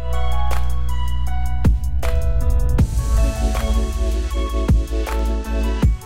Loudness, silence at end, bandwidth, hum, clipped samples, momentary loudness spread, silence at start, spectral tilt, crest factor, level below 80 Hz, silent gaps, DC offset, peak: -21 LUFS; 0 s; 15 kHz; none; under 0.1%; 5 LU; 0 s; -6.5 dB/octave; 12 dB; -20 dBFS; none; under 0.1%; -4 dBFS